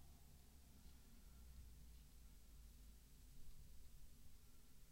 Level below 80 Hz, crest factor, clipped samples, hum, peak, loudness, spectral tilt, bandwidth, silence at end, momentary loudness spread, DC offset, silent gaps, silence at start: -64 dBFS; 14 dB; under 0.1%; none; -46 dBFS; -67 LUFS; -4 dB/octave; 16 kHz; 0 s; 4 LU; under 0.1%; none; 0 s